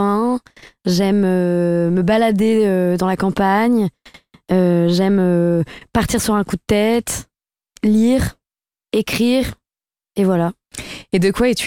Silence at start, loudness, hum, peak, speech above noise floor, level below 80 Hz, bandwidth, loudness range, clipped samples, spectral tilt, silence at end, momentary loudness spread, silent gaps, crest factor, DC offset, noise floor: 0 s; -17 LUFS; none; -2 dBFS; over 74 dB; -40 dBFS; 17 kHz; 3 LU; under 0.1%; -6 dB/octave; 0 s; 9 LU; none; 16 dB; under 0.1%; under -90 dBFS